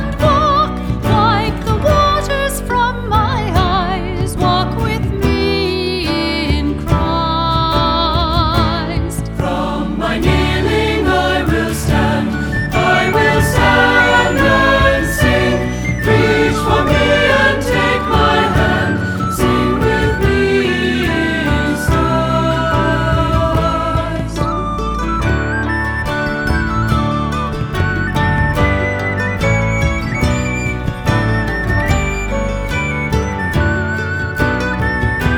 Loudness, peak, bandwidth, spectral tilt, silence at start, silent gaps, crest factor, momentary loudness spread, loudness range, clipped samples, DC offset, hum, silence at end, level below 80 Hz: -15 LUFS; -2 dBFS; over 20 kHz; -5.5 dB/octave; 0 s; none; 14 dB; 7 LU; 5 LU; under 0.1%; under 0.1%; none; 0 s; -24 dBFS